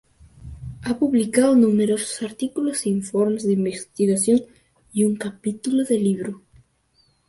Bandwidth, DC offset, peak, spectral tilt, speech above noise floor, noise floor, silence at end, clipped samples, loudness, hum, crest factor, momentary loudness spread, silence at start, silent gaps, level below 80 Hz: 12 kHz; under 0.1%; -4 dBFS; -5.5 dB/octave; 43 dB; -63 dBFS; 0.9 s; under 0.1%; -21 LUFS; none; 18 dB; 13 LU; 0.4 s; none; -52 dBFS